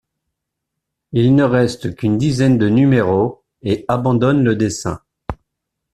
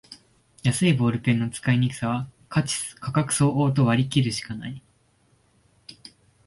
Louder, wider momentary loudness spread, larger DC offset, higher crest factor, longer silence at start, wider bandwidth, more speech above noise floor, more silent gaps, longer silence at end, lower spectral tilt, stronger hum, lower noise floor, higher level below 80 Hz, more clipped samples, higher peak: first, -16 LUFS vs -24 LUFS; about the same, 16 LU vs 14 LU; neither; about the same, 14 dB vs 16 dB; first, 1.15 s vs 0.1 s; about the same, 12 kHz vs 11.5 kHz; first, 64 dB vs 40 dB; neither; about the same, 0.6 s vs 0.55 s; first, -7 dB/octave vs -5.5 dB/octave; neither; first, -78 dBFS vs -63 dBFS; first, -44 dBFS vs -56 dBFS; neither; first, -2 dBFS vs -8 dBFS